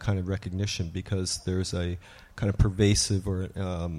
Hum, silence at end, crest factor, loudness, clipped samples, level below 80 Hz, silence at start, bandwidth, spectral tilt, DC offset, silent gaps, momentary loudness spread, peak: none; 0 s; 20 dB; -28 LUFS; under 0.1%; -40 dBFS; 0 s; 13 kHz; -5 dB/octave; under 0.1%; none; 10 LU; -8 dBFS